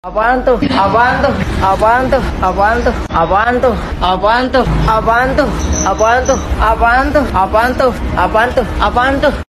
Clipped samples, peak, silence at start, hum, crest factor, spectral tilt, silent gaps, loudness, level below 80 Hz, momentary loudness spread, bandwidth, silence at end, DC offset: under 0.1%; 0 dBFS; 0.05 s; none; 12 dB; -5 dB/octave; none; -12 LUFS; -22 dBFS; 4 LU; 13.5 kHz; 0.1 s; under 0.1%